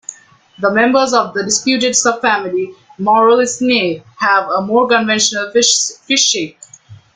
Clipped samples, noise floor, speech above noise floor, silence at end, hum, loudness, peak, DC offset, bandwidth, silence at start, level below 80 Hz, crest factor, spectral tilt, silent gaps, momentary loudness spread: under 0.1%; -40 dBFS; 27 dB; 0.2 s; none; -13 LUFS; 0 dBFS; under 0.1%; 9.8 kHz; 0.1 s; -58 dBFS; 14 dB; -2 dB/octave; none; 9 LU